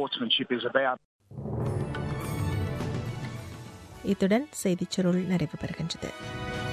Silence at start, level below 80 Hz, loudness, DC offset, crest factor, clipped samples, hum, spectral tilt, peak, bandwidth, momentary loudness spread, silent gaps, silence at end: 0 s; -48 dBFS; -30 LUFS; under 0.1%; 20 dB; under 0.1%; none; -5.5 dB/octave; -10 dBFS; 14.5 kHz; 13 LU; 1.05-1.19 s; 0 s